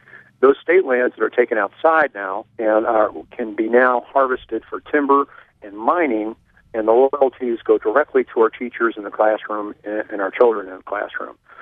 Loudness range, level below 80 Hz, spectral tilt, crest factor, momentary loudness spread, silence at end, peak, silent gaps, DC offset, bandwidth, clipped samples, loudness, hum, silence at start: 2 LU; -60 dBFS; -7.5 dB/octave; 18 dB; 12 LU; 0 s; 0 dBFS; none; under 0.1%; 4 kHz; under 0.1%; -19 LUFS; none; 0.4 s